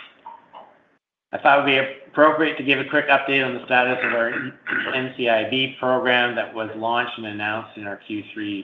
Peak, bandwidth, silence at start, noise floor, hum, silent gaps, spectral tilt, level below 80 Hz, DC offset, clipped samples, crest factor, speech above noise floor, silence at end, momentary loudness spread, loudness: -2 dBFS; 6 kHz; 0 s; -65 dBFS; none; none; -6.5 dB/octave; -72 dBFS; under 0.1%; under 0.1%; 20 dB; 44 dB; 0 s; 13 LU; -20 LUFS